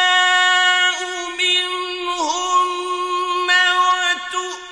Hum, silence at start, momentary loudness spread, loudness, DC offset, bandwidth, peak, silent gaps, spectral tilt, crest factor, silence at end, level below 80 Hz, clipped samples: none; 0 s; 10 LU; -16 LUFS; under 0.1%; 11 kHz; -4 dBFS; none; 2 dB/octave; 14 dB; 0 s; -60 dBFS; under 0.1%